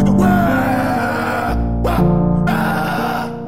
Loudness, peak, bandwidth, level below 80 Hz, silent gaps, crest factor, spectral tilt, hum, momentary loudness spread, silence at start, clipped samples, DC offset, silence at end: -16 LUFS; -2 dBFS; 16 kHz; -28 dBFS; none; 14 dB; -7.5 dB/octave; none; 6 LU; 0 s; under 0.1%; 2%; 0 s